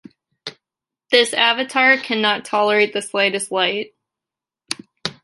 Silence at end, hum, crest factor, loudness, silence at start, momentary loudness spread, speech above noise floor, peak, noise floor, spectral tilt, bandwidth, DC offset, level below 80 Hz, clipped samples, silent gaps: 0.1 s; none; 20 dB; -17 LUFS; 0.45 s; 20 LU; 70 dB; -2 dBFS; -88 dBFS; -2 dB/octave; 12 kHz; under 0.1%; -70 dBFS; under 0.1%; none